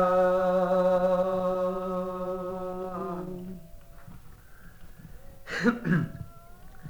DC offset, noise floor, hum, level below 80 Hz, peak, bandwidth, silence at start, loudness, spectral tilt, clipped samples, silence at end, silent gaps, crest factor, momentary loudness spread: under 0.1%; -48 dBFS; none; -50 dBFS; -8 dBFS; over 20 kHz; 0 s; -28 LUFS; -7.5 dB/octave; under 0.1%; 0 s; none; 20 dB; 18 LU